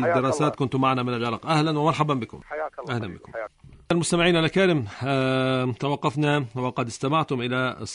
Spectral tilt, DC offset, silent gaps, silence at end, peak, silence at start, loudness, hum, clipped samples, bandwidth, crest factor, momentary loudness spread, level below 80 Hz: -5.5 dB/octave; under 0.1%; none; 0 s; -6 dBFS; 0 s; -24 LUFS; none; under 0.1%; 11 kHz; 18 dB; 12 LU; -54 dBFS